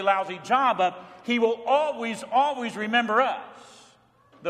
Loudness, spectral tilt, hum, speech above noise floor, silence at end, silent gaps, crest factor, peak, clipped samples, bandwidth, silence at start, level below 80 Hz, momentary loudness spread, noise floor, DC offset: -24 LUFS; -4 dB/octave; none; 33 dB; 0 s; none; 18 dB; -8 dBFS; under 0.1%; 12 kHz; 0 s; -76 dBFS; 9 LU; -58 dBFS; under 0.1%